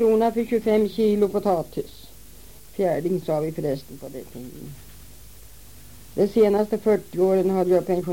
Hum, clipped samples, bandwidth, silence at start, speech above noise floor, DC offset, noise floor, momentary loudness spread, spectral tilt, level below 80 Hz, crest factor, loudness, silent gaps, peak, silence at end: none; under 0.1%; 17 kHz; 0 s; 25 dB; 0.5%; -47 dBFS; 19 LU; -7 dB/octave; -52 dBFS; 16 dB; -22 LUFS; none; -8 dBFS; 0 s